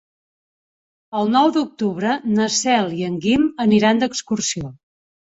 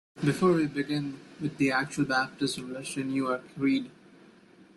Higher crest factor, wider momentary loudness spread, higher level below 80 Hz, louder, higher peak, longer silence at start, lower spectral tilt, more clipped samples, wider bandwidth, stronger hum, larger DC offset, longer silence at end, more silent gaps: about the same, 16 dB vs 18 dB; second, 8 LU vs 11 LU; first, -54 dBFS vs -66 dBFS; first, -19 LUFS vs -29 LUFS; first, -4 dBFS vs -12 dBFS; first, 1.1 s vs 0.15 s; second, -4 dB/octave vs -5.5 dB/octave; neither; second, 8 kHz vs 12 kHz; neither; neither; second, 0.6 s vs 0.85 s; neither